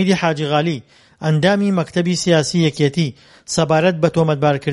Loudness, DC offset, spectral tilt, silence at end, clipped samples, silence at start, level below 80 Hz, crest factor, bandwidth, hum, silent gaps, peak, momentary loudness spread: -17 LUFS; under 0.1%; -5.5 dB/octave; 0 s; under 0.1%; 0 s; -52 dBFS; 16 dB; 11.5 kHz; none; none; 0 dBFS; 8 LU